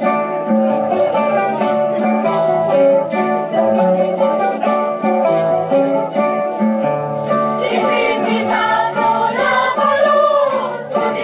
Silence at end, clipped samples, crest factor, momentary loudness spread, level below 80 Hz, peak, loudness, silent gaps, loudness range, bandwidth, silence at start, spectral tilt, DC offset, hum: 0 s; under 0.1%; 12 dB; 4 LU; -62 dBFS; -2 dBFS; -15 LUFS; none; 2 LU; 4 kHz; 0 s; -9.5 dB/octave; under 0.1%; none